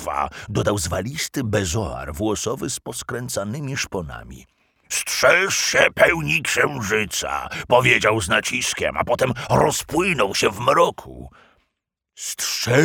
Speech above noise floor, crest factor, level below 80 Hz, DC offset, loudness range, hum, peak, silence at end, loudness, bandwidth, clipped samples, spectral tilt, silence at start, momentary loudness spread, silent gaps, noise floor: 58 dB; 20 dB; -46 dBFS; under 0.1%; 7 LU; none; 0 dBFS; 0 s; -20 LUFS; over 20 kHz; under 0.1%; -3.5 dB/octave; 0 s; 11 LU; none; -79 dBFS